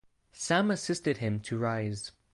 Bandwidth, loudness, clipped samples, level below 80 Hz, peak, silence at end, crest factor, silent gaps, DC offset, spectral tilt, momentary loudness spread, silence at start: 11.5 kHz; -31 LUFS; under 0.1%; -62 dBFS; -12 dBFS; 0.25 s; 20 dB; none; under 0.1%; -5 dB/octave; 10 LU; 0.35 s